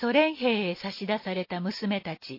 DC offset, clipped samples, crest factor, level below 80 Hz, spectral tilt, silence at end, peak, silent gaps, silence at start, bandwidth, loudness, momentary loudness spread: under 0.1%; under 0.1%; 20 dB; -70 dBFS; -6.5 dB/octave; 0 s; -8 dBFS; none; 0 s; 5.8 kHz; -28 LUFS; 8 LU